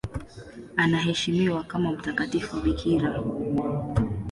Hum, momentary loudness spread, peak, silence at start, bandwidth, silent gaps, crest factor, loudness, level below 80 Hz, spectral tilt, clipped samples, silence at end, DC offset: none; 8 LU; -8 dBFS; 0.05 s; 11.5 kHz; none; 18 dB; -26 LUFS; -42 dBFS; -6 dB/octave; under 0.1%; 0 s; under 0.1%